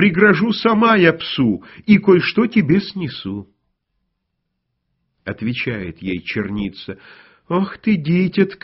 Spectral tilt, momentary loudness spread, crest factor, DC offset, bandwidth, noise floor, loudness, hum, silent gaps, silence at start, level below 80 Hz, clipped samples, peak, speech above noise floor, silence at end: -5 dB/octave; 16 LU; 18 dB; under 0.1%; 6 kHz; -74 dBFS; -17 LUFS; none; none; 0 s; -50 dBFS; under 0.1%; 0 dBFS; 57 dB; 0.1 s